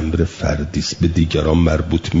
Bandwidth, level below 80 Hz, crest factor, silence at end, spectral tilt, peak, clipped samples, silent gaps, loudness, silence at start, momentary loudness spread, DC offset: 7.8 kHz; -28 dBFS; 14 dB; 0 s; -6.5 dB/octave; -2 dBFS; under 0.1%; none; -18 LUFS; 0 s; 6 LU; under 0.1%